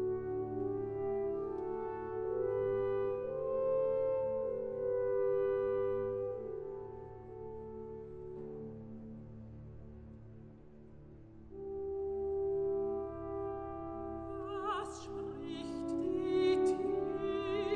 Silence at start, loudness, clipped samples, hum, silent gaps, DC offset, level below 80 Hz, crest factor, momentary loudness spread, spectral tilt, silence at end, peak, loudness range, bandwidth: 0 s; -37 LUFS; under 0.1%; none; none; under 0.1%; -60 dBFS; 16 dB; 19 LU; -7 dB/octave; 0 s; -22 dBFS; 14 LU; 9.6 kHz